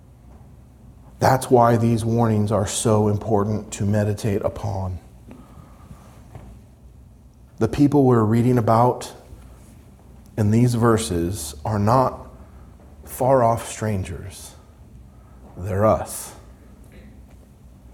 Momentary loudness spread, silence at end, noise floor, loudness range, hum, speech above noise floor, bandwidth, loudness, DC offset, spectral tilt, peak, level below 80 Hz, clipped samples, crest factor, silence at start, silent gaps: 16 LU; 0.25 s; -47 dBFS; 8 LU; none; 28 dB; 17 kHz; -20 LUFS; under 0.1%; -6.5 dB/octave; -2 dBFS; -46 dBFS; under 0.1%; 20 dB; 0.9 s; none